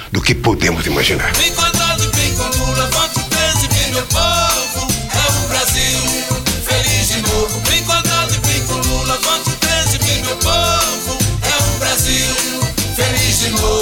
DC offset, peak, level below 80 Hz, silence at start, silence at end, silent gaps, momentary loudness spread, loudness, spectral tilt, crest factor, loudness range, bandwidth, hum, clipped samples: 0.5%; 0 dBFS; -26 dBFS; 0 s; 0 s; none; 4 LU; -14 LUFS; -2.5 dB/octave; 14 dB; 1 LU; over 20 kHz; none; under 0.1%